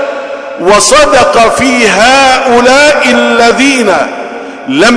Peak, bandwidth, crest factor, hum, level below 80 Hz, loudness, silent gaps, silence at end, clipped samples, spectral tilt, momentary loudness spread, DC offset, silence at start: 0 dBFS; 11 kHz; 6 dB; none; -34 dBFS; -5 LUFS; none; 0 s; 2%; -2.5 dB/octave; 13 LU; under 0.1%; 0 s